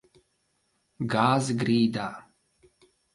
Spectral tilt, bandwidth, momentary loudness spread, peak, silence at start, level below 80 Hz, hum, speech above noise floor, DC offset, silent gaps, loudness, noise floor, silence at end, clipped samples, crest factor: -6 dB/octave; 11.5 kHz; 13 LU; -8 dBFS; 1 s; -66 dBFS; none; 48 dB; under 0.1%; none; -26 LUFS; -73 dBFS; 0.95 s; under 0.1%; 20 dB